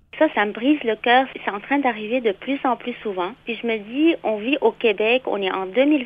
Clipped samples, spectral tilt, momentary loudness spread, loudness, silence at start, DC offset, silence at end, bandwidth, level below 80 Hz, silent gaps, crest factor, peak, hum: under 0.1%; -7 dB/octave; 9 LU; -21 LUFS; 0.15 s; under 0.1%; 0 s; 5 kHz; -62 dBFS; none; 16 dB; -4 dBFS; none